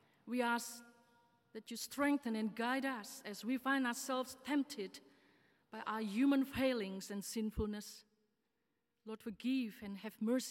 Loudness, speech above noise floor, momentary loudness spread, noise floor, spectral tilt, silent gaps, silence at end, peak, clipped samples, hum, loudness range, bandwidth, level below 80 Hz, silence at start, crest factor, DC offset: -40 LUFS; 47 dB; 15 LU; -86 dBFS; -4 dB/octave; none; 0 s; -24 dBFS; under 0.1%; none; 4 LU; 16.5 kHz; -64 dBFS; 0.25 s; 16 dB; under 0.1%